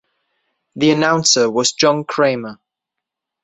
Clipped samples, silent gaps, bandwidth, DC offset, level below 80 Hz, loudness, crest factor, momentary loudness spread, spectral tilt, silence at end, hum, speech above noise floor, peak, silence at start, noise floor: under 0.1%; none; 8.4 kHz; under 0.1%; -60 dBFS; -15 LUFS; 18 dB; 6 LU; -3 dB/octave; 0.9 s; none; 67 dB; -2 dBFS; 0.75 s; -82 dBFS